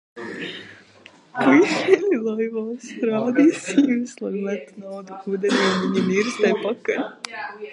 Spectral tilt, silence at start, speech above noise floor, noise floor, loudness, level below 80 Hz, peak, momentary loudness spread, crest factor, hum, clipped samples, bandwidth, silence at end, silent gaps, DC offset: -5 dB/octave; 0.15 s; 28 dB; -50 dBFS; -21 LUFS; -74 dBFS; -2 dBFS; 16 LU; 20 dB; none; under 0.1%; 11 kHz; 0 s; none; under 0.1%